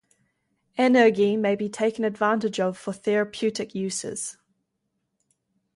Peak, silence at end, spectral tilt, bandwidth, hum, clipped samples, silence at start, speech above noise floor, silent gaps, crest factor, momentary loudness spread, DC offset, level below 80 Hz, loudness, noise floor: -6 dBFS; 1.45 s; -4.5 dB/octave; 11.5 kHz; none; under 0.1%; 0.75 s; 54 dB; none; 20 dB; 12 LU; under 0.1%; -70 dBFS; -24 LUFS; -78 dBFS